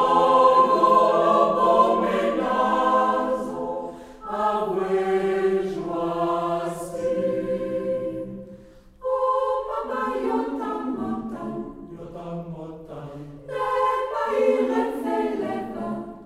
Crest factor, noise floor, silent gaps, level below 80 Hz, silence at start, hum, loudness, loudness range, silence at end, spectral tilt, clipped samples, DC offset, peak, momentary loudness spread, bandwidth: 18 dB; -47 dBFS; none; -54 dBFS; 0 s; none; -23 LUFS; 10 LU; 0 s; -6 dB/octave; under 0.1%; under 0.1%; -6 dBFS; 18 LU; 13.5 kHz